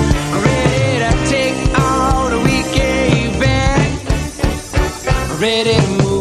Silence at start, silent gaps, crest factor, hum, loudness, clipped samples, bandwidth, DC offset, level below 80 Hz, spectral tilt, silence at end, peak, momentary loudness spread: 0 s; none; 14 dB; none; -15 LUFS; under 0.1%; 14 kHz; under 0.1%; -22 dBFS; -5 dB/octave; 0 s; 0 dBFS; 5 LU